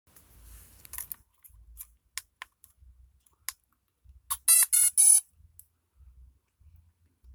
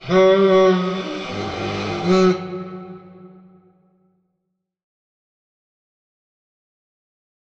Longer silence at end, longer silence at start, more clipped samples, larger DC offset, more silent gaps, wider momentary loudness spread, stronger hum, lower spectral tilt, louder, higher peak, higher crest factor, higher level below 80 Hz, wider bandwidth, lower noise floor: second, 2.15 s vs 4.25 s; first, 0.95 s vs 0 s; neither; neither; neither; first, 24 LU vs 18 LU; neither; second, 3 dB/octave vs -6.5 dB/octave; about the same, -20 LUFS vs -18 LUFS; about the same, -8 dBFS vs -6 dBFS; first, 22 dB vs 16 dB; about the same, -60 dBFS vs -56 dBFS; first, over 20 kHz vs 7.4 kHz; about the same, -74 dBFS vs -76 dBFS